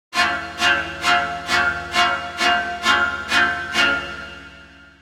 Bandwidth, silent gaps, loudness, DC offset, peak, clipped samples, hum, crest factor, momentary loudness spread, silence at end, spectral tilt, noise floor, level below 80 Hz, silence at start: 16.5 kHz; none; -19 LUFS; under 0.1%; -2 dBFS; under 0.1%; none; 20 dB; 6 LU; 0.15 s; -2 dB/octave; -44 dBFS; -48 dBFS; 0.1 s